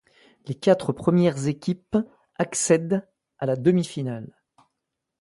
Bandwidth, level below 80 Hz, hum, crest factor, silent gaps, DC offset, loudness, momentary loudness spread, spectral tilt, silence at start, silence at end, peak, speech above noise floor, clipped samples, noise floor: 11.5 kHz; -60 dBFS; none; 20 dB; none; under 0.1%; -24 LUFS; 15 LU; -6 dB/octave; 0.45 s; 0.95 s; -6 dBFS; 59 dB; under 0.1%; -82 dBFS